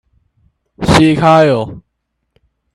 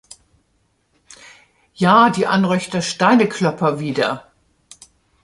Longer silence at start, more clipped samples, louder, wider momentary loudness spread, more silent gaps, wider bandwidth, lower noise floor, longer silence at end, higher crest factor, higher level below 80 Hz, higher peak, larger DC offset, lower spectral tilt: second, 0.8 s vs 1.8 s; neither; first, -10 LUFS vs -16 LUFS; first, 12 LU vs 9 LU; neither; about the same, 12.5 kHz vs 11.5 kHz; first, -70 dBFS vs -64 dBFS; about the same, 0.95 s vs 1.05 s; about the same, 14 dB vs 18 dB; first, -36 dBFS vs -60 dBFS; about the same, 0 dBFS vs -2 dBFS; neither; about the same, -6 dB/octave vs -5.5 dB/octave